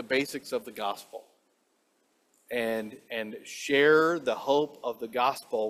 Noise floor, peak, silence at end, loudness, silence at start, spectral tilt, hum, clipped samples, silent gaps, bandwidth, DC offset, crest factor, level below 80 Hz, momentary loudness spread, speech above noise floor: -72 dBFS; -10 dBFS; 0 s; -28 LUFS; 0 s; -4 dB/octave; none; under 0.1%; none; 15.5 kHz; under 0.1%; 20 dB; -76 dBFS; 15 LU; 43 dB